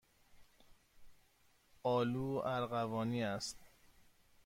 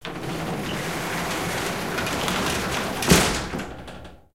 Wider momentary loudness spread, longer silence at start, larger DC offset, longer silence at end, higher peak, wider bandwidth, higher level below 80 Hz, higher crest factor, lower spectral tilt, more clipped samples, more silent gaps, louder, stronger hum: second, 7 LU vs 15 LU; first, 0.35 s vs 0 s; second, under 0.1% vs 0.4%; first, 0.8 s vs 0 s; second, -24 dBFS vs -2 dBFS; about the same, 16.5 kHz vs 17 kHz; second, -68 dBFS vs -40 dBFS; second, 16 dB vs 24 dB; first, -5.5 dB/octave vs -3.5 dB/octave; neither; neither; second, -39 LUFS vs -24 LUFS; neither